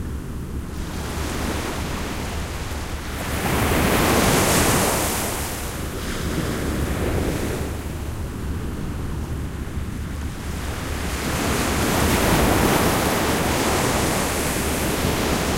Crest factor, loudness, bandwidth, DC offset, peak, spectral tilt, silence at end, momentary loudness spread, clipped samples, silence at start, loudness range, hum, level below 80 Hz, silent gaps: 18 dB; -23 LUFS; 16 kHz; under 0.1%; -4 dBFS; -4 dB/octave; 0 s; 12 LU; under 0.1%; 0 s; 9 LU; none; -30 dBFS; none